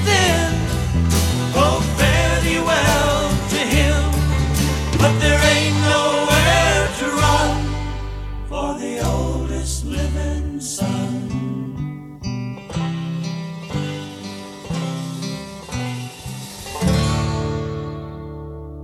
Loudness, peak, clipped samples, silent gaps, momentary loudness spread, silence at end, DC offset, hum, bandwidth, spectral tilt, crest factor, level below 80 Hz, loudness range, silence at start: -19 LUFS; 0 dBFS; under 0.1%; none; 15 LU; 0 s; under 0.1%; none; 16.5 kHz; -4.5 dB/octave; 18 dB; -26 dBFS; 11 LU; 0 s